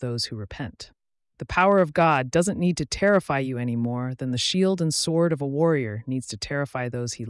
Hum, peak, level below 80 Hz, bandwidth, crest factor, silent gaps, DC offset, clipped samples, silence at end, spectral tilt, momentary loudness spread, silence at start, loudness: none; -10 dBFS; -52 dBFS; 12 kHz; 14 dB; none; under 0.1%; under 0.1%; 0 s; -5 dB/octave; 12 LU; 0 s; -24 LUFS